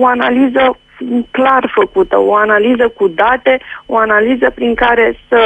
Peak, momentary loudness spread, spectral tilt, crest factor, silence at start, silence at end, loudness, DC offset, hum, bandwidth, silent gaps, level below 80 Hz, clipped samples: 0 dBFS; 6 LU; -6.5 dB/octave; 10 dB; 0 s; 0 s; -11 LUFS; under 0.1%; none; 8.2 kHz; none; -40 dBFS; under 0.1%